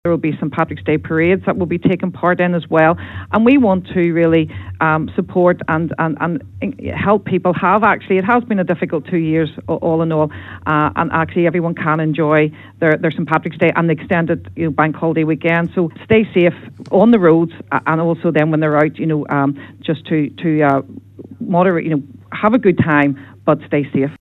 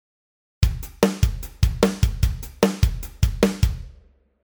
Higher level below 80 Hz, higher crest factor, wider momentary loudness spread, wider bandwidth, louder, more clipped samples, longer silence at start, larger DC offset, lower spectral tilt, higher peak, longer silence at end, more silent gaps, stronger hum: second, -44 dBFS vs -26 dBFS; second, 14 dB vs 20 dB; first, 7 LU vs 4 LU; second, 4.1 kHz vs over 20 kHz; first, -16 LUFS vs -23 LUFS; neither; second, 0.05 s vs 0.6 s; neither; first, -9.5 dB/octave vs -6 dB/octave; about the same, -2 dBFS vs -2 dBFS; second, 0.05 s vs 0.55 s; neither; neither